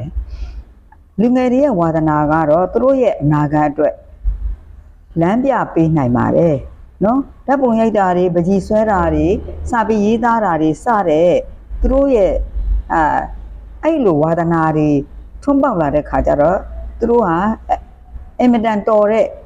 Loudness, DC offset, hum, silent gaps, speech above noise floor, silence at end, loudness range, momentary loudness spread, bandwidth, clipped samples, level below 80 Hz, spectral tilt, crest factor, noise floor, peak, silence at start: -15 LUFS; under 0.1%; none; none; 30 dB; 0 s; 2 LU; 12 LU; 9.6 kHz; under 0.1%; -28 dBFS; -8.5 dB/octave; 12 dB; -43 dBFS; -4 dBFS; 0 s